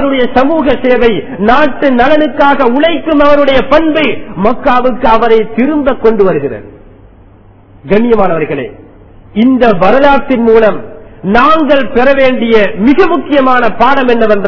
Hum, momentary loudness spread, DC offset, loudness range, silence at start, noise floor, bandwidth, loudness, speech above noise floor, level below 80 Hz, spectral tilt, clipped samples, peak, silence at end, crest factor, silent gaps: none; 6 LU; 10%; 4 LU; 0 s; -38 dBFS; 6 kHz; -8 LUFS; 30 dB; -30 dBFS; -7.5 dB/octave; 4%; 0 dBFS; 0 s; 10 dB; none